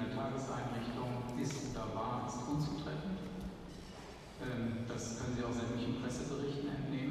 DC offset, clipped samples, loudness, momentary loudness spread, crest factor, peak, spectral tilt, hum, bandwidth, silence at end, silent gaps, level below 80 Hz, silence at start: under 0.1%; under 0.1%; -40 LUFS; 8 LU; 14 dB; -26 dBFS; -6 dB/octave; none; 14 kHz; 0 s; none; -56 dBFS; 0 s